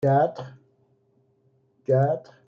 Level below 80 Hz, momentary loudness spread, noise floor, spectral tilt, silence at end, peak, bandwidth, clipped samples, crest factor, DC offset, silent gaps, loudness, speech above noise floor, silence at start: -70 dBFS; 19 LU; -66 dBFS; -9.5 dB/octave; 0.3 s; -10 dBFS; 6.6 kHz; under 0.1%; 16 dB; under 0.1%; none; -23 LUFS; 43 dB; 0 s